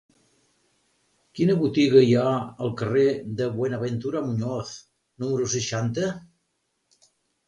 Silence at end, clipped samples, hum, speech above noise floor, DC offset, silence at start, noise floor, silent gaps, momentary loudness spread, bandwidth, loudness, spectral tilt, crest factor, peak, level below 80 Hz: 1.25 s; under 0.1%; none; 52 dB; under 0.1%; 1.35 s; -75 dBFS; none; 15 LU; 10 kHz; -24 LUFS; -6 dB/octave; 20 dB; -4 dBFS; -60 dBFS